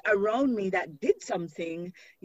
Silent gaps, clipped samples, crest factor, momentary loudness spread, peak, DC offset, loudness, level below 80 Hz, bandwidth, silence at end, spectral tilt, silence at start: none; under 0.1%; 18 dB; 11 LU; -12 dBFS; under 0.1%; -29 LUFS; -68 dBFS; 8 kHz; 0.35 s; -5.5 dB/octave; 0.05 s